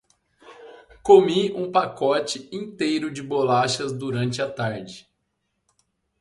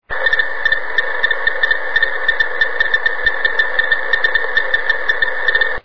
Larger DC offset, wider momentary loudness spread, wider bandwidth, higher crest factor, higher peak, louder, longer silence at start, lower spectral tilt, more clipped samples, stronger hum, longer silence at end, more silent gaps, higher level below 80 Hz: second, under 0.1% vs 9%; first, 15 LU vs 2 LU; first, 11.5 kHz vs 5.4 kHz; first, 22 dB vs 16 dB; about the same, -2 dBFS vs 0 dBFS; second, -22 LUFS vs -15 LUFS; first, 0.5 s vs 0 s; first, -5 dB/octave vs -2.5 dB/octave; neither; neither; first, 1.2 s vs 0 s; neither; second, -62 dBFS vs -42 dBFS